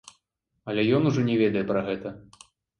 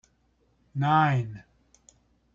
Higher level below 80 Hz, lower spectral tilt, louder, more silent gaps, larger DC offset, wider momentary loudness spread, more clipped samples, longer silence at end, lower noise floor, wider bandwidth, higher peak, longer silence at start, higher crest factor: about the same, -62 dBFS vs -62 dBFS; about the same, -7 dB/octave vs -7.5 dB/octave; about the same, -25 LUFS vs -26 LUFS; neither; neither; second, 13 LU vs 17 LU; neither; second, 0.6 s vs 0.95 s; first, -77 dBFS vs -68 dBFS; first, 10.5 kHz vs 7.4 kHz; about the same, -10 dBFS vs -10 dBFS; about the same, 0.65 s vs 0.75 s; about the same, 16 dB vs 20 dB